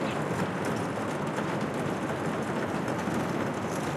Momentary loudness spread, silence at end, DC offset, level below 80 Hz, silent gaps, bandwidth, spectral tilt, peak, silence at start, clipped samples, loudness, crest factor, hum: 1 LU; 0 s; under 0.1%; -62 dBFS; none; 15.5 kHz; -6 dB/octave; -16 dBFS; 0 s; under 0.1%; -31 LUFS; 14 dB; none